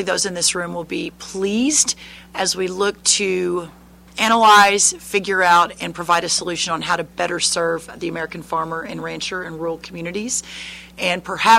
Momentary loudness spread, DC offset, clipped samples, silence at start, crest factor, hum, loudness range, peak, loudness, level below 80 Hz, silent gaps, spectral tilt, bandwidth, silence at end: 14 LU; under 0.1%; under 0.1%; 0 s; 18 dB; none; 9 LU; -2 dBFS; -18 LUFS; -52 dBFS; none; -2 dB/octave; 16 kHz; 0 s